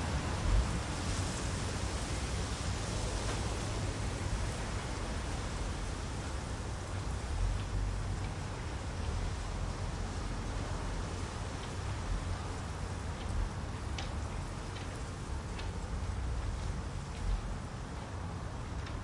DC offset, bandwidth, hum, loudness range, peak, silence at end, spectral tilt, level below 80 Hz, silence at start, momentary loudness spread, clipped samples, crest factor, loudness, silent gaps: under 0.1%; 11.5 kHz; none; 4 LU; -18 dBFS; 0 s; -5 dB/octave; -40 dBFS; 0 s; 5 LU; under 0.1%; 18 dB; -38 LUFS; none